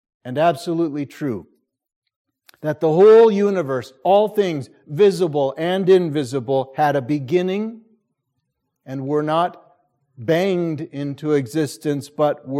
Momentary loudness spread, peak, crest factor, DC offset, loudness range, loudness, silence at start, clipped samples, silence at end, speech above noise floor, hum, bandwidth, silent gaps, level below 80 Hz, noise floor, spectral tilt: 12 LU; -2 dBFS; 16 dB; under 0.1%; 8 LU; -19 LUFS; 0.25 s; under 0.1%; 0 s; 57 dB; none; 14.5 kHz; 1.96-2.02 s, 2.16-2.25 s; -68 dBFS; -75 dBFS; -7 dB/octave